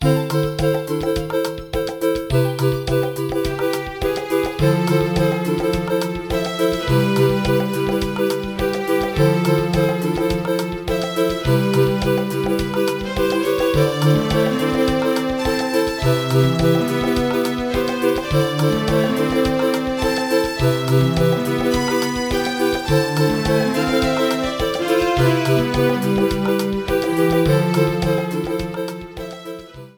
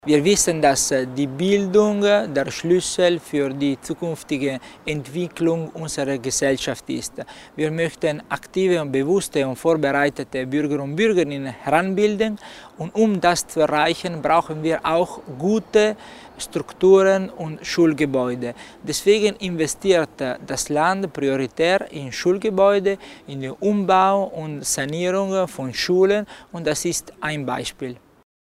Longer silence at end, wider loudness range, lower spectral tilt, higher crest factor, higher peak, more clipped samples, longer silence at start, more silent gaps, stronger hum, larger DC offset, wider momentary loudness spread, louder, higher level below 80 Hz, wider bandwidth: second, 0.05 s vs 0.5 s; about the same, 2 LU vs 4 LU; first, -6 dB/octave vs -4.5 dB/octave; about the same, 16 dB vs 18 dB; about the same, -2 dBFS vs -2 dBFS; neither; about the same, 0 s vs 0.05 s; neither; neither; first, 0.1% vs under 0.1%; second, 6 LU vs 11 LU; about the same, -19 LUFS vs -21 LUFS; first, -36 dBFS vs -52 dBFS; first, over 20 kHz vs 16 kHz